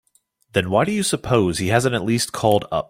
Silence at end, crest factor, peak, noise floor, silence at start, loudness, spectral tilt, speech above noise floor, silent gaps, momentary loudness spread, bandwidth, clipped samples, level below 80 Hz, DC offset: 0.05 s; 18 dB; -2 dBFS; -62 dBFS; 0.55 s; -20 LUFS; -5 dB/octave; 43 dB; none; 3 LU; 16.5 kHz; under 0.1%; -48 dBFS; under 0.1%